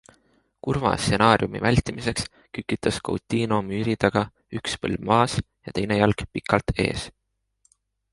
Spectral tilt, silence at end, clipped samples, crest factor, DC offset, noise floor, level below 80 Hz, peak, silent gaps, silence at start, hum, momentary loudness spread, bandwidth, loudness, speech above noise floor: -5.5 dB/octave; 1.05 s; under 0.1%; 22 dB; under 0.1%; -68 dBFS; -42 dBFS; -2 dBFS; none; 0.65 s; none; 11 LU; 11.5 kHz; -24 LUFS; 44 dB